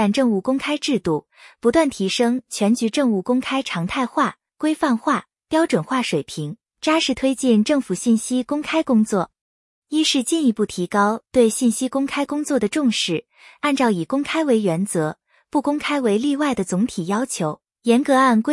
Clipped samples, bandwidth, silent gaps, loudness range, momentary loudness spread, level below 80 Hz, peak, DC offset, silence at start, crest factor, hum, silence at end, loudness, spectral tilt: under 0.1%; 12 kHz; 9.41-9.82 s; 2 LU; 6 LU; -56 dBFS; -4 dBFS; under 0.1%; 0 s; 16 dB; none; 0 s; -20 LUFS; -4.5 dB/octave